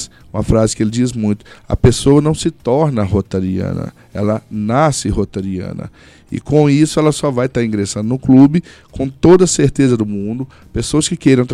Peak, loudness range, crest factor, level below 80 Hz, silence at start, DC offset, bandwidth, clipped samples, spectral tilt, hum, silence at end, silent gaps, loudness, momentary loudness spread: 0 dBFS; 5 LU; 14 dB; -34 dBFS; 0 s; under 0.1%; 12.5 kHz; under 0.1%; -6 dB/octave; none; 0 s; none; -14 LUFS; 14 LU